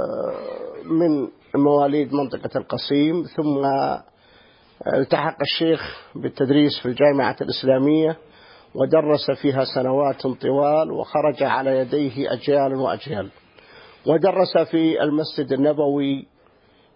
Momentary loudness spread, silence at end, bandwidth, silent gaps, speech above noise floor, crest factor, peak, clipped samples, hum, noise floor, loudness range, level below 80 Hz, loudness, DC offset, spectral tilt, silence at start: 10 LU; 0.75 s; 5.4 kHz; none; 36 dB; 18 dB; -4 dBFS; under 0.1%; none; -56 dBFS; 3 LU; -60 dBFS; -21 LUFS; under 0.1%; -11 dB/octave; 0 s